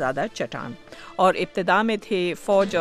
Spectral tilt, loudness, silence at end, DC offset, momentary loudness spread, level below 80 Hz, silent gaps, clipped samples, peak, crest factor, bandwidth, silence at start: -5 dB/octave; -23 LUFS; 0 s; under 0.1%; 15 LU; -56 dBFS; none; under 0.1%; -6 dBFS; 18 dB; 13.5 kHz; 0 s